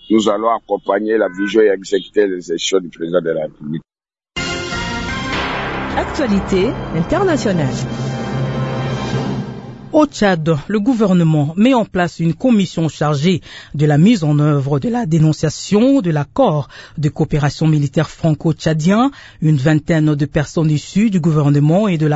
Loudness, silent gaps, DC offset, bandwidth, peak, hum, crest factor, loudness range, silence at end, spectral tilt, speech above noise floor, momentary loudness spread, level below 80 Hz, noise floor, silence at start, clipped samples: -16 LUFS; none; under 0.1%; 8 kHz; 0 dBFS; none; 16 dB; 5 LU; 0 s; -6.5 dB/octave; 20 dB; 8 LU; -40 dBFS; -35 dBFS; 0.1 s; under 0.1%